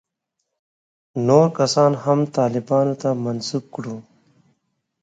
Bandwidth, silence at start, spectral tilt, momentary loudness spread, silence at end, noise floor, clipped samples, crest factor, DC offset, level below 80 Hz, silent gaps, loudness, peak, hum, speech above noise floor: 9.4 kHz; 1.15 s; -6.5 dB/octave; 16 LU; 1 s; -78 dBFS; under 0.1%; 20 dB; under 0.1%; -66 dBFS; none; -19 LUFS; 0 dBFS; none; 59 dB